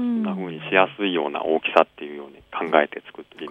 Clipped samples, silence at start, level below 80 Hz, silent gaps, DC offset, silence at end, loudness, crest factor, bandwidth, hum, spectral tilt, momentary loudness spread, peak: under 0.1%; 0 s; -66 dBFS; none; under 0.1%; 0 s; -22 LUFS; 24 dB; 8 kHz; none; -7 dB/octave; 18 LU; 0 dBFS